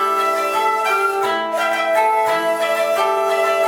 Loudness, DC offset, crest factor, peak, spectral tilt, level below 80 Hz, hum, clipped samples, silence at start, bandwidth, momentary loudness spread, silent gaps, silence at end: -17 LUFS; under 0.1%; 12 dB; -6 dBFS; -1.5 dB/octave; -68 dBFS; none; under 0.1%; 0 s; 20 kHz; 3 LU; none; 0 s